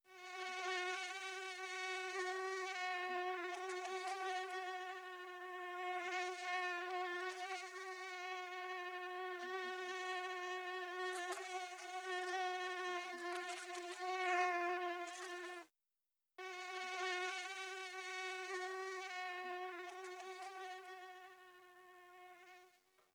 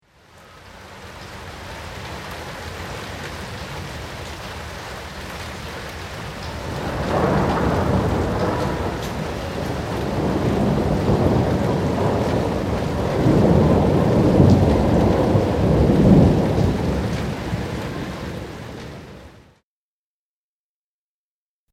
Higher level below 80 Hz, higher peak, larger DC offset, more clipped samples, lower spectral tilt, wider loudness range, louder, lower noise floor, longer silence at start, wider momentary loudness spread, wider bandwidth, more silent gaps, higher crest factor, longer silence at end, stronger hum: second, under -90 dBFS vs -32 dBFS; second, -26 dBFS vs 0 dBFS; neither; neither; second, 0.5 dB/octave vs -7.5 dB/octave; second, 5 LU vs 16 LU; second, -44 LUFS vs -20 LUFS; about the same, under -90 dBFS vs under -90 dBFS; second, 0.05 s vs 0.55 s; second, 11 LU vs 17 LU; first, over 20 kHz vs 16 kHz; neither; about the same, 20 dB vs 20 dB; second, 0.45 s vs 2.4 s; neither